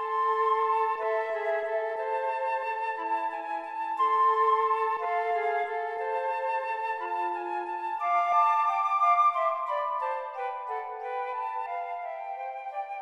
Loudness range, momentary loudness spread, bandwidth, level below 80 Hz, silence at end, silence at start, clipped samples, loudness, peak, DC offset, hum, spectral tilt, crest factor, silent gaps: 4 LU; 11 LU; 11.5 kHz; -84 dBFS; 0 s; 0 s; under 0.1%; -28 LUFS; -14 dBFS; under 0.1%; none; -2 dB/octave; 16 dB; none